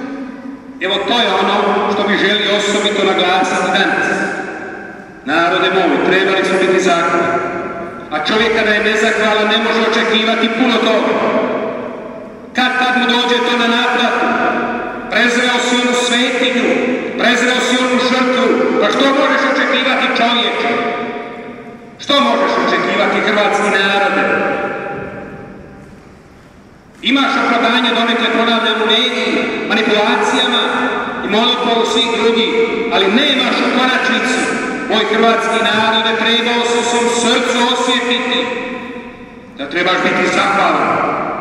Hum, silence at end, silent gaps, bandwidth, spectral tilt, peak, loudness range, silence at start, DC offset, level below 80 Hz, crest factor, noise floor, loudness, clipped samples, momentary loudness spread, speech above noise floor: none; 0 s; none; 12 kHz; -3 dB/octave; 0 dBFS; 3 LU; 0 s; under 0.1%; -52 dBFS; 14 dB; -41 dBFS; -13 LUFS; under 0.1%; 11 LU; 27 dB